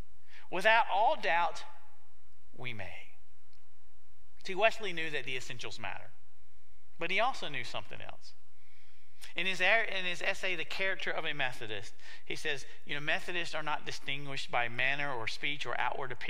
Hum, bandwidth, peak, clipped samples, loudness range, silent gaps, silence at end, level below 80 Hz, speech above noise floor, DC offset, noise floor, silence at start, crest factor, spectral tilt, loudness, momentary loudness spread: none; 16 kHz; -10 dBFS; under 0.1%; 6 LU; none; 0 s; -68 dBFS; 34 dB; 3%; -69 dBFS; 0.3 s; 24 dB; -3 dB/octave; -33 LUFS; 17 LU